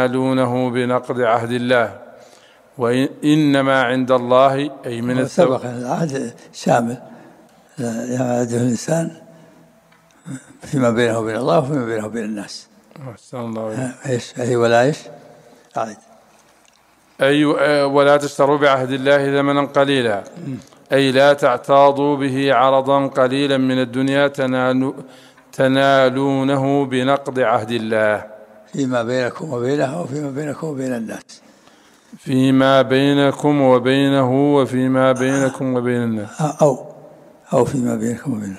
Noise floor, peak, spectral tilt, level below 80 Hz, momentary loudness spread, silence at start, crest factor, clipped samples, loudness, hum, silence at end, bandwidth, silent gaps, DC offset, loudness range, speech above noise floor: -54 dBFS; 0 dBFS; -6 dB/octave; -62 dBFS; 13 LU; 0 s; 16 dB; under 0.1%; -17 LUFS; none; 0 s; 13.5 kHz; none; under 0.1%; 7 LU; 37 dB